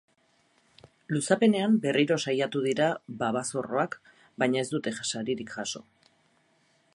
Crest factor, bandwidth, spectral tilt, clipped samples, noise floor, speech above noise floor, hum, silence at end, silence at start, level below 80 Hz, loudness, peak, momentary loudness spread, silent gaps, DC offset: 20 dB; 11.5 kHz; -4.5 dB/octave; under 0.1%; -68 dBFS; 40 dB; none; 1.15 s; 1.1 s; -72 dBFS; -28 LUFS; -8 dBFS; 10 LU; none; under 0.1%